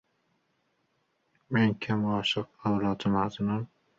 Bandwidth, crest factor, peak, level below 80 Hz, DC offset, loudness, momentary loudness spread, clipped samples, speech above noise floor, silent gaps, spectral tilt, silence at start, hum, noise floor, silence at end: 7.8 kHz; 18 dB; -12 dBFS; -60 dBFS; under 0.1%; -29 LUFS; 5 LU; under 0.1%; 46 dB; none; -6.5 dB/octave; 1.5 s; none; -74 dBFS; 0.35 s